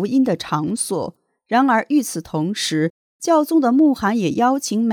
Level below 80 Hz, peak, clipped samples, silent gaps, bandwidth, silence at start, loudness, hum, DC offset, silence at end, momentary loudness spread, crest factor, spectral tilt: -58 dBFS; -4 dBFS; under 0.1%; 2.90-3.20 s; 18.5 kHz; 0 s; -19 LUFS; none; under 0.1%; 0 s; 9 LU; 14 dB; -5 dB/octave